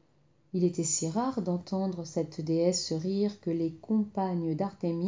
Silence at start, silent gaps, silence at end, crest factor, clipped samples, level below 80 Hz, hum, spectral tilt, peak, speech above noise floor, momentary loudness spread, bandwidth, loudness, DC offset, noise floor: 0.55 s; none; 0 s; 16 dB; under 0.1%; -70 dBFS; none; -5.5 dB/octave; -14 dBFS; 37 dB; 5 LU; 7.8 kHz; -31 LUFS; under 0.1%; -67 dBFS